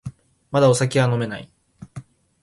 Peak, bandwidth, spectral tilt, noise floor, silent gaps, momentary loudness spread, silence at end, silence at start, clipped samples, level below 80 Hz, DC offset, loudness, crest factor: -4 dBFS; 11.5 kHz; -5.5 dB/octave; -41 dBFS; none; 23 LU; 0.4 s; 0.05 s; under 0.1%; -54 dBFS; under 0.1%; -19 LUFS; 18 dB